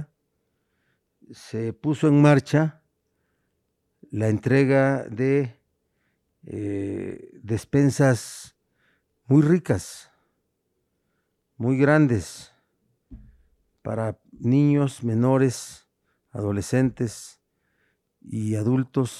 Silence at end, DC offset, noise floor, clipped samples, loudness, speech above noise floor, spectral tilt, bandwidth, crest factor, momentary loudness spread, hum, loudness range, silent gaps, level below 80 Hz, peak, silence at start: 0 s; under 0.1%; -75 dBFS; under 0.1%; -23 LUFS; 53 dB; -7.5 dB/octave; 12.5 kHz; 18 dB; 20 LU; none; 3 LU; none; -58 dBFS; -6 dBFS; 0 s